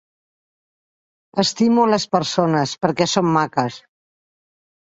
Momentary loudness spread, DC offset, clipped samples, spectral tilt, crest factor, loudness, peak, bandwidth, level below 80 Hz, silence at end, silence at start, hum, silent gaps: 6 LU; under 0.1%; under 0.1%; -5 dB/octave; 18 dB; -18 LUFS; -2 dBFS; 8 kHz; -60 dBFS; 1.1 s; 1.35 s; none; none